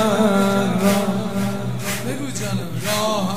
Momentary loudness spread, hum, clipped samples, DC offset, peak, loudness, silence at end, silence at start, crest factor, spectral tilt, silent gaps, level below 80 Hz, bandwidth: 8 LU; none; under 0.1%; 2%; -2 dBFS; -20 LUFS; 0 s; 0 s; 18 dB; -5 dB/octave; none; -54 dBFS; 16 kHz